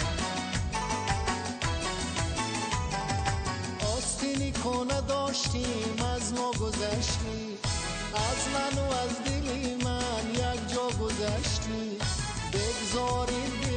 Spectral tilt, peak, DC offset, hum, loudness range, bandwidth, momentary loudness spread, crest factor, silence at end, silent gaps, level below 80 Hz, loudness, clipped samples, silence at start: -4 dB/octave; -14 dBFS; under 0.1%; none; 1 LU; 9.4 kHz; 3 LU; 16 dB; 0 s; none; -40 dBFS; -30 LUFS; under 0.1%; 0 s